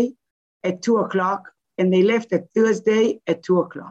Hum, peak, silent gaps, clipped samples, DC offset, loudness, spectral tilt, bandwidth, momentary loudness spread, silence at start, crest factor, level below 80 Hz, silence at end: none; -6 dBFS; 0.31-0.60 s; under 0.1%; under 0.1%; -21 LUFS; -6.5 dB/octave; 8 kHz; 9 LU; 0 s; 14 dB; -70 dBFS; 0 s